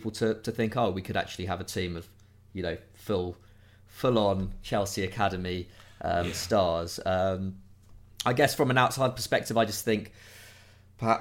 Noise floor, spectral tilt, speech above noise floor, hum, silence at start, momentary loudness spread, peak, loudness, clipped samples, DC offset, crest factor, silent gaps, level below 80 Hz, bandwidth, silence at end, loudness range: -54 dBFS; -5 dB/octave; 26 dB; none; 0 s; 13 LU; -8 dBFS; -29 LUFS; under 0.1%; under 0.1%; 22 dB; none; -52 dBFS; 16.5 kHz; 0 s; 5 LU